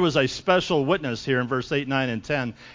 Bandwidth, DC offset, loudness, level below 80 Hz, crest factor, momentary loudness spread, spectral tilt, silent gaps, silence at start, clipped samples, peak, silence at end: 7.6 kHz; under 0.1%; -24 LUFS; -52 dBFS; 20 dB; 5 LU; -5.5 dB/octave; none; 0 s; under 0.1%; -4 dBFS; 0 s